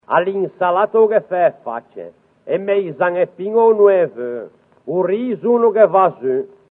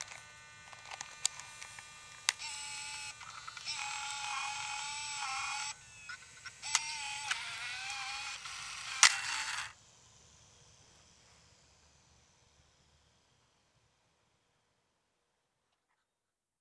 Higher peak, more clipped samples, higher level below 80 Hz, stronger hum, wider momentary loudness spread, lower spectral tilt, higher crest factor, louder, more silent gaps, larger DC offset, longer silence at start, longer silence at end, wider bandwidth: first, 0 dBFS vs -4 dBFS; neither; about the same, -72 dBFS vs -74 dBFS; neither; about the same, 16 LU vs 15 LU; first, -10 dB/octave vs 2.5 dB/octave; second, 16 dB vs 38 dB; first, -16 LUFS vs -36 LUFS; neither; neither; about the same, 0.1 s vs 0 s; second, 0.25 s vs 5.25 s; second, 3.9 kHz vs 11 kHz